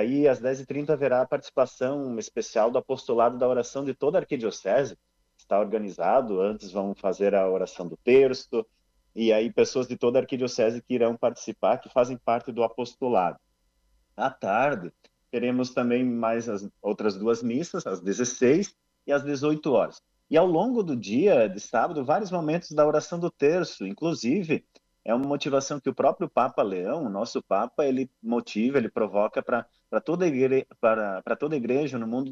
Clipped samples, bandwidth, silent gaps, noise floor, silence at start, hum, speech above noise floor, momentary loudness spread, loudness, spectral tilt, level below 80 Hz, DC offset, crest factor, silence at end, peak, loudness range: under 0.1%; 7.8 kHz; none; -69 dBFS; 0 s; none; 44 dB; 8 LU; -26 LUFS; -5.5 dB/octave; -68 dBFS; under 0.1%; 16 dB; 0 s; -8 dBFS; 3 LU